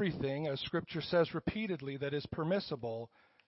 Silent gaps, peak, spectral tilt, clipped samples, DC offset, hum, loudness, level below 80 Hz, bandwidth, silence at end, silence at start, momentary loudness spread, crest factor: none; -20 dBFS; -5 dB/octave; under 0.1%; under 0.1%; none; -37 LUFS; -62 dBFS; 5.8 kHz; 0.4 s; 0 s; 8 LU; 16 dB